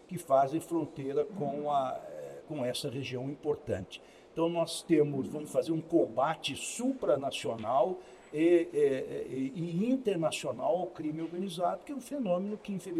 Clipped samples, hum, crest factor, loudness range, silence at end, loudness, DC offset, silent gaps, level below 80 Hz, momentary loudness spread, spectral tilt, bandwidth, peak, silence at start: under 0.1%; none; 18 dB; 4 LU; 0 s; -32 LUFS; under 0.1%; none; -70 dBFS; 10 LU; -5.5 dB/octave; 14 kHz; -14 dBFS; 0.1 s